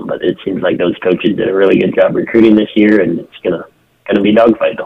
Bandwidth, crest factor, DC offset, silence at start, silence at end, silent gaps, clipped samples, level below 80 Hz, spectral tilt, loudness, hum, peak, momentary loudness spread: 4.9 kHz; 12 dB; under 0.1%; 0 s; 0 s; none; 0.2%; -48 dBFS; -8.5 dB/octave; -12 LUFS; none; 0 dBFS; 10 LU